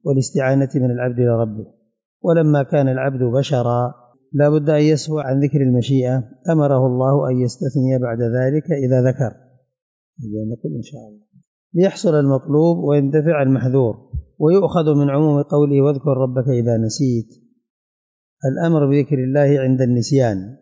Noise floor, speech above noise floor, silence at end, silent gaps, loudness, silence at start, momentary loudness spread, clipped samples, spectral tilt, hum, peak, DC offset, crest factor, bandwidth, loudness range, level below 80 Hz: under -90 dBFS; over 74 dB; 0.05 s; 2.05-2.20 s, 9.82-10.13 s, 11.47-11.70 s, 17.70-18.37 s; -17 LUFS; 0.05 s; 10 LU; under 0.1%; -8 dB/octave; none; -4 dBFS; under 0.1%; 12 dB; 7.8 kHz; 4 LU; -48 dBFS